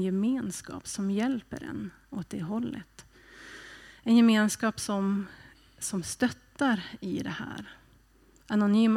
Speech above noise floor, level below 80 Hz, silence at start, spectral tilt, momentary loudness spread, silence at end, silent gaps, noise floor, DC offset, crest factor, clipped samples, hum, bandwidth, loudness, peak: 32 dB; -62 dBFS; 0 s; -5 dB/octave; 20 LU; 0 s; none; -61 dBFS; under 0.1%; 18 dB; under 0.1%; none; 15 kHz; -29 LUFS; -12 dBFS